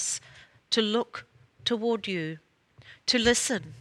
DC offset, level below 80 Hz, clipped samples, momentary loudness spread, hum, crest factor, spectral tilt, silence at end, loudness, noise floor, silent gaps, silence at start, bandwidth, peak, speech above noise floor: under 0.1%; -56 dBFS; under 0.1%; 15 LU; none; 22 dB; -2.5 dB/octave; 0 s; -27 LUFS; -54 dBFS; none; 0 s; 14.5 kHz; -8 dBFS; 27 dB